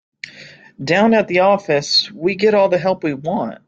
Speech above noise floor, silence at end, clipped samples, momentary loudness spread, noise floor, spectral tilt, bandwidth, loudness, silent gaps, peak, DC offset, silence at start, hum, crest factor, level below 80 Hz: 26 dB; 0.15 s; under 0.1%; 16 LU; -41 dBFS; -4.5 dB/octave; 8 kHz; -16 LUFS; none; -2 dBFS; under 0.1%; 0.25 s; none; 14 dB; -60 dBFS